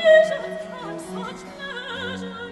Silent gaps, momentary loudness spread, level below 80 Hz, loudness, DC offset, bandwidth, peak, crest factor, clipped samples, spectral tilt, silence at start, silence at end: none; 17 LU; -60 dBFS; -25 LUFS; under 0.1%; 12 kHz; -6 dBFS; 18 dB; under 0.1%; -4.5 dB/octave; 0 s; 0 s